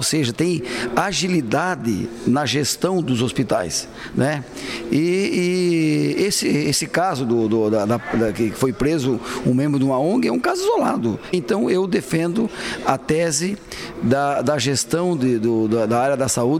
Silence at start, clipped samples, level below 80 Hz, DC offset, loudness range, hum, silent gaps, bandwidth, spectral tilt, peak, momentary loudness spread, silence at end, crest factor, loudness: 0 s; under 0.1%; -48 dBFS; under 0.1%; 2 LU; none; none; 16 kHz; -5 dB/octave; -2 dBFS; 5 LU; 0 s; 16 dB; -20 LUFS